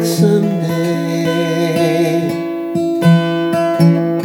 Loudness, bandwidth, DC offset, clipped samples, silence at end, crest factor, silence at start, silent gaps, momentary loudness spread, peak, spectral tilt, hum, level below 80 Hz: -14 LUFS; 17.5 kHz; under 0.1%; under 0.1%; 0 s; 14 dB; 0 s; none; 6 LU; 0 dBFS; -6.5 dB/octave; none; -64 dBFS